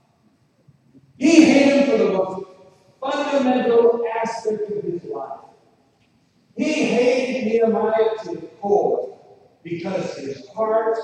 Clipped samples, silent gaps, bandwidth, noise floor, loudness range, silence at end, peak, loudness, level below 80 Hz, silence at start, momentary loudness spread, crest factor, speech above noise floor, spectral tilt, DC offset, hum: under 0.1%; none; 9.8 kHz; -60 dBFS; 6 LU; 0 s; 0 dBFS; -19 LUFS; -68 dBFS; 1.2 s; 17 LU; 20 dB; 39 dB; -5 dB/octave; under 0.1%; none